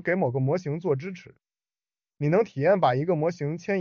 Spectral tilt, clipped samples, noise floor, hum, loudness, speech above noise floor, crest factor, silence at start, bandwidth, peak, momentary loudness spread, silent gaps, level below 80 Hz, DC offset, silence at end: -7 dB/octave; under 0.1%; under -90 dBFS; none; -25 LUFS; over 65 dB; 16 dB; 0.05 s; 7 kHz; -10 dBFS; 9 LU; none; -68 dBFS; under 0.1%; 0 s